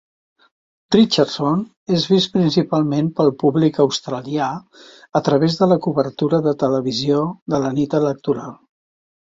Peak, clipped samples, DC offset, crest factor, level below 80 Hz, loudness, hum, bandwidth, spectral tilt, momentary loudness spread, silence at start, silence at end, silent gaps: -2 dBFS; under 0.1%; under 0.1%; 16 dB; -58 dBFS; -18 LUFS; none; 7.8 kHz; -6.5 dB/octave; 7 LU; 0.9 s; 0.8 s; 1.77-1.86 s, 7.42-7.46 s